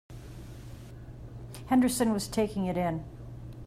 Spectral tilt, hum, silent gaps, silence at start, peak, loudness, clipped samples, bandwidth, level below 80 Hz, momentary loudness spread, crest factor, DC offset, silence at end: -5.5 dB/octave; none; none; 0.1 s; -16 dBFS; -29 LUFS; under 0.1%; 16 kHz; -50 dBFS; 20 LU; 16 dB; under 0.1%; 0 s